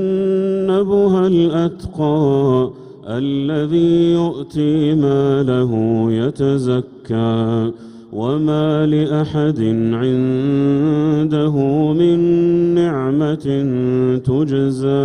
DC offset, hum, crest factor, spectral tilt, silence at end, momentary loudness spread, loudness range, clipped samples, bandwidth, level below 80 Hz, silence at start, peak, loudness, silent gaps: under 0.1%; none; 12 dB; -9 dB/octave; 0 s; 6 LU; 3 LU; under 0.1%; 10 kHz; -48 dBFS; 0 s; -4 dBFS; -16 LUFS; none